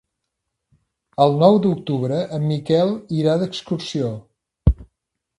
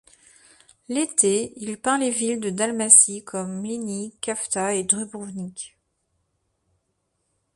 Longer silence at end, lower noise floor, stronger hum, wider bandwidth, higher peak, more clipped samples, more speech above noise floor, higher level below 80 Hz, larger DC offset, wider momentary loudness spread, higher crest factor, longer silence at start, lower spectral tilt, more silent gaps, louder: second, 0.55 s vs 1.9 s; first, -78 dBFS vs -74 dBFS; neither; about the same, 11.5 kHz vs 11.5 kHz; about the same, 0 dBFS vs 0 dBFS; neither; first, 60 dB vs 51 dB; first, -32 dBFS vs -68 dBFS; neither; second, 12 LU vs 21 LU; about the same, 20 dB vs 24 dB; first, 1.2 s vs 0.9 s; first, -8 dB/octave vs -2.5 dB/octave; neither; about the same, -20 LUFS vs -21 LUFS